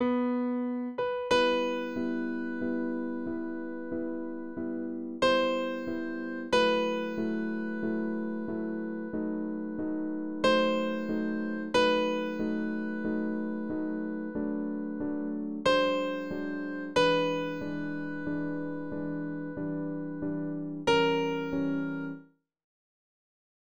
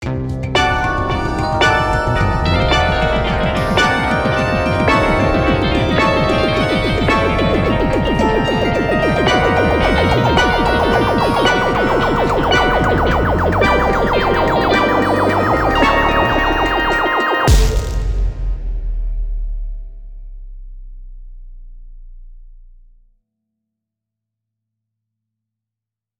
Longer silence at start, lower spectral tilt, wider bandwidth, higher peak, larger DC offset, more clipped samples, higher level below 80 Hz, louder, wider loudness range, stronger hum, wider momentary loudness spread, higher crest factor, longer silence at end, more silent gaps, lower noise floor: about the same, 0 s vs 0 s; about the same, -5.5 dB/octave vs -5.5 dB/octave; about the same, over 20 kHz vs 20 kHz; second, -12 dBFS vs -2 dBFS; first, 0.3% vs under 0.1%; neither; second, -62 dBFS vs -24 dBFS; second, -31 LUFS vs -15 LUFS; second, 4 LU vs 7 LU; neither; about the same, 10 LU vs 8 LU; about the same, 18 dB vs 14 dB; second, 1.1 s vs 3.55 s; neither; second, -52 dBFS vs -85 dBFS